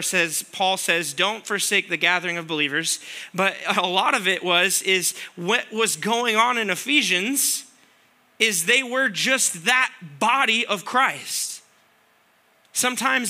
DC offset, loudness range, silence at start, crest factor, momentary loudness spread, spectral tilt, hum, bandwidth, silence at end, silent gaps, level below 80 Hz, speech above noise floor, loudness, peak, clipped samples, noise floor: under 0.1%; 2 LU; 0 s; 20 dB; 7 LU; -1 dB/octave; none; 16 kHz; 0 s; none; -82 dBFS; 38 dB; -21 LUFS; -2 dBFS; under 0.1%; -60 dBFS